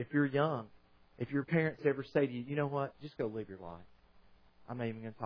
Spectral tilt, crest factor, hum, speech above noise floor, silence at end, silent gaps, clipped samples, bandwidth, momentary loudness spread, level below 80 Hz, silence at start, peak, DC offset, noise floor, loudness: -6.5 dB/octave; 20 dB; none; 27 dB; 0 s; none; under 0.1%; 5.4 kHz; 16 LU; -70 dBFS; 0 s; -16 dBFS; under 0.1%; -63 dBFS; -36 LUFS